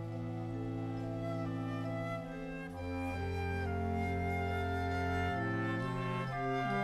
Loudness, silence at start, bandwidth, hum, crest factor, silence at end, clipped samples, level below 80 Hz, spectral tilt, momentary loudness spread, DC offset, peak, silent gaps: -37 LUFS; 0 s; 12.5 kHz; none; 12 dB; 0 s; under 0.1%; -52 dBFS; -7.5 dB/octave; 6 LU; under 0.1%; -24 dBFS; none